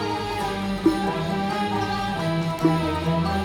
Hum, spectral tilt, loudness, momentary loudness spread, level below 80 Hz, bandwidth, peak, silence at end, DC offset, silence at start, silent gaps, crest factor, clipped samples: none; -6.5 dB/octave; -24 LUFS; 4 LU; -44 dBFS; 17.5 kHz; -6 dBFS; 0 s; under 0.1%; 0 s; none; 16 dB; under 0.1%